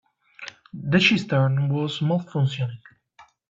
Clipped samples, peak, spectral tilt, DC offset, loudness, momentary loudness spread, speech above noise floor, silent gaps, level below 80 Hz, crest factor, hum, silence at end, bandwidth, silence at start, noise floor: under 0.1%; -4 dBFS; -6.5 dB/octave; under 0.1%; -22 LUFS; 21 LU; 33 dB; none; -62 dBFS; 20 dB; none; 0.25 s; 7.6 kHz; 0.4 s; -55 dBFS